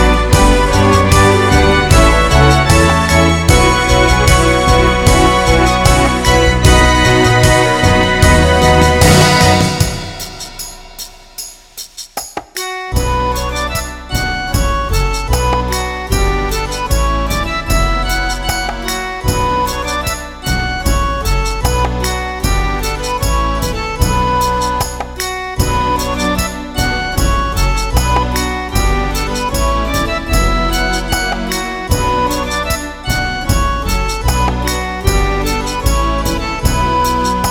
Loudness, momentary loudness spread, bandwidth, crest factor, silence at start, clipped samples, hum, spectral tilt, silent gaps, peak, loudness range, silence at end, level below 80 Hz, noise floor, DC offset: -13 LUFS; 10 LU; 17.5 kHz; 12 dB; 0 s; under 0.1%; none; -4.5 dB/octave; none; 0 dBFS; 7 LU; 0 s; -18 dBFS; -32 dBFS; under 0.1%